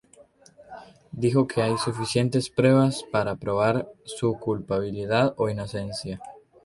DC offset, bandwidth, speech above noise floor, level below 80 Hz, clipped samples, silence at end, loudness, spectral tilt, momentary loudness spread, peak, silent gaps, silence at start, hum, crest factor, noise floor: under 0.1%; 11.5 kHz; 30 dB; -56 dBFS; under 0.1%; 0.25 s; -25 LUFS; -6 dB/octave; 19 LU; -6 dBFS; none; 0.6 s; none; 18 dB; -55 dBFS